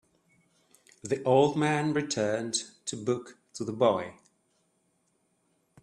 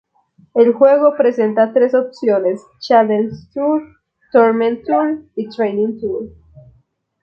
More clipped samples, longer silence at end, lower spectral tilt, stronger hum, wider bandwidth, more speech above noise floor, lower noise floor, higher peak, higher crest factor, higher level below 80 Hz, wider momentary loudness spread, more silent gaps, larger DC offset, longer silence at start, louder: neither; first, 1.7 s vs 0.95 s; second, -4.5 dB/octave vs -7.5 dB/octave; neither; first, 12 kHz vs 6.8 kHz; about the same, 45 dB vs 43 dB; first, -73 dBFS vs -57 dBFS; second, -10 dBFS vs 0 dBFS; about the same, 20 dB vs 16 dB; second, -72 dBFS vs -56 dBFS; about the same, 14 LU vs 12 LU; neither; neither; first, 1.05 s vs 0.55 s; second, -28 LUFS vs -15 LUFS